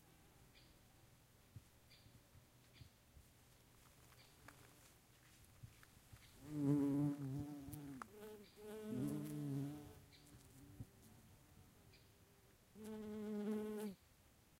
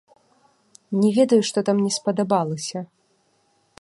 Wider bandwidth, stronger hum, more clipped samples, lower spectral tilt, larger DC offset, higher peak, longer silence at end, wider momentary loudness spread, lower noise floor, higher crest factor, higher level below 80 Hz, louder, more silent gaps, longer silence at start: first, 16 kHz vs 11.5 kHz; neither; neither; first, -7.5 dB/octave vs -5.5 dB/octave; neither; second, -28 dBFS vs -4 dBFS; second, 0.05 s vs 0.95 s; first, 24 LU vs 13 LU; first, -71 dBFS vs -65 dBFS; about the same, 22 dB vs 18 dB; about the same, -74 dBFS vs -70 dBFS; second, -46 LUFS vs -21 LUFS; neither; second, 0 s vs 0.9 s